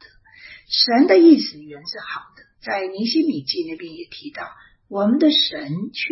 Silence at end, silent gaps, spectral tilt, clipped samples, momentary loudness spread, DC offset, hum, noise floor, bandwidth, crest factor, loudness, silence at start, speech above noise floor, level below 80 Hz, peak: 0 s; none; -7 dB/octave; under 0.1%; 21 LU; under 0.1%; none; -46 dBFS; 6 kHz; 18 dB; -17 LUFS; 0.45 s; 27 dB; -64 dBFS; -2 dBFS